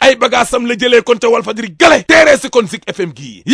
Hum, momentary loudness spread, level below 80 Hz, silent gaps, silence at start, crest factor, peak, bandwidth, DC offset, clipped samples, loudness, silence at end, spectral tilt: none; 14 LU; -44 dBFS; none; 0 s; 10 dB; 0 dBFS; 11 kHz; under 0.1%; 1%; -10 LUFS; 0 s; -3 dB/octave